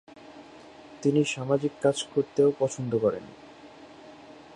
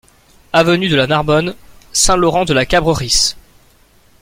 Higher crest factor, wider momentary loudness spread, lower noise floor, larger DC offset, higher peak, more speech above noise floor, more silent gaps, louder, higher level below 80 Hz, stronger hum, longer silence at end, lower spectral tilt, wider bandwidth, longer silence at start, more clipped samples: about the same, 18 dB vs 16 dB; first, 24 LU vs 5 LU; about the same, -49 dBFS vs -49 dBFS; neither; second, -10 dBFS vs 0 dBFS; second, 23 dB vs 36 dB; neither; second, -26 LUFS vs -13 LUFS; second, -66 dBFS vs -32 dBFS; neither; second, 0.25 s vs 0.8 s; first, -5.5 dB/octave vs -3.5 dB/octave; second, 11 kHz vs 16.5 kHz; second, 0.15 s vs 0.55 s; neither